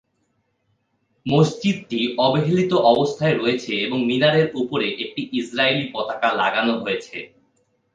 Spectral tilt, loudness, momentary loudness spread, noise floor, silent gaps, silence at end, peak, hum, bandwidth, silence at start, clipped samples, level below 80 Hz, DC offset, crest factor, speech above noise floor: -6 dB/octave; -20 LUFS; 9 LU; -69 dBFS; none; 0.7 s; -2 dBFS; none; 9.4 kHz; 1.25 s; under 0.1%; -62 dBFS; under 0.1%; 18 dB; 49 dB